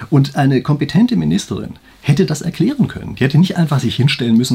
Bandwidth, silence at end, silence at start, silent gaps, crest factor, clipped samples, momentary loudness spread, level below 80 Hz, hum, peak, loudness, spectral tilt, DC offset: 15 kHz; 0 s; 0 s; none; 14 dB; under 0.1%; 6 LU; -46 dBFS; none; 0 dBFS; -15 LUFS; -6.5 dB/octave; under 0.1%